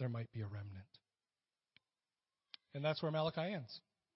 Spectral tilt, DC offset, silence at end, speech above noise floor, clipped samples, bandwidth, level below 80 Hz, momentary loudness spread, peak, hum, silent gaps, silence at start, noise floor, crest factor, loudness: -5 dB/octave; under 0.1%; 0.35 s; over 48 dB; under 0.1%; 5.8 kHz; -80 dBFS; 19 LU; -24 dBFS; none; none; 0 s; under -90 dBFS; 20 dB; -42 LUFS